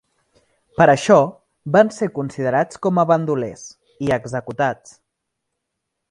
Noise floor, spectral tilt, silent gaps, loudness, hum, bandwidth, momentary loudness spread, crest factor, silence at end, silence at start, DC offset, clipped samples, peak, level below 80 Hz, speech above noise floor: -78 dBFS; -6 dB/octave; none; -18 LUFS; none; 11 kHz; 15 LU; 20 dB; 1.35 s; 0.8 s; under 0.1%; under 0.1%; 0 dBFS; -56 dBFS; 61 dB